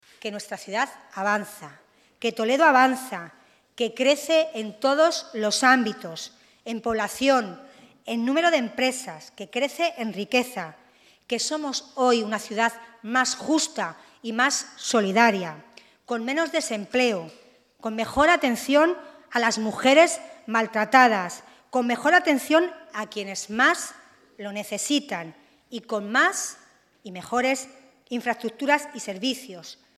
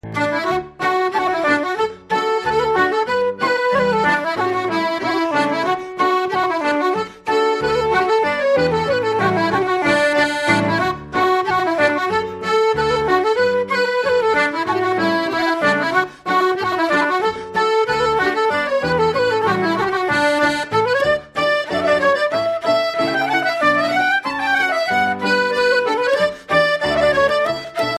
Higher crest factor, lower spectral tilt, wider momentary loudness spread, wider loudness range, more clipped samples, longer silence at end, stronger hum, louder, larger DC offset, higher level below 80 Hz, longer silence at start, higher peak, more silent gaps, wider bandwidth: first, 22 dB vs 16 dB; second, -2.5 dB/octave vs -4.5 dB/octave; first, 17 LU vs 4 LU; first, 6 LU vs 1 LU; neither; first, 0.25 s vs 0 s; neither; second, -23 LUFS vs -17 LUFS; neither; second, -64 dBFS vs -48 dBFS; first, 0.25 s vs 0.05 s; about the same, -2 dBFS vs -2 dBFS; neither; about the same, 15 kHz vs 15 kHz